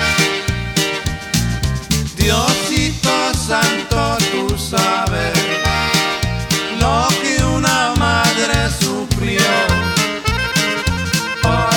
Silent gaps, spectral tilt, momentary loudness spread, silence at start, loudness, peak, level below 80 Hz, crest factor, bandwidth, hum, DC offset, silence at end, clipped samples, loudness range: none; -3.5 dB/octave; 5 LU; 0 s; -16 LUFS; 0 dBFS; -28 dBFS; 16 dB; over 20 kHz; none; under 0.1%; 0 s; under 0.1%; 1 LU